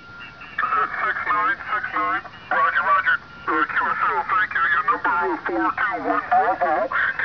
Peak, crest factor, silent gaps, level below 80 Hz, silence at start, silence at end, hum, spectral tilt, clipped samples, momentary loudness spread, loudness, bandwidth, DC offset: -8 dBFS; 14 dB; none; -56 dBFS; 0 s; 0 s; none; -5.5 dB/octave; under 0.1%; 6 LU; -21 LUFS; 5.4 kHz; 0.2%